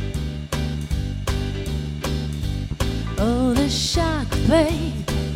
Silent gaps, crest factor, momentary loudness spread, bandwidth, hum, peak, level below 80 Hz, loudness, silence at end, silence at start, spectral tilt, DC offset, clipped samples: none; 16 dB; 8 LU; 16.5 kHz; none; -6 dBFS; -28 dBFS; -23 LUFS; 0 s; 0 s; -5.5 dB/octave; under 0.1%; under 0.1%